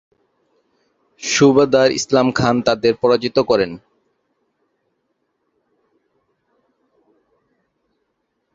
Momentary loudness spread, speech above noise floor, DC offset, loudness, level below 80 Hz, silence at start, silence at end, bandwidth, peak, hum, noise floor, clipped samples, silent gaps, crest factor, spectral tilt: 8 LU; 56 dB; under 0.1%; -16 LUFS; -54 dBFS; 1.2 s; 4.8 s; 7.8 kHz; -2 dBFS; none; -71 dBFS; under 0.1%; none; 18 dB; -4.5 dB/octave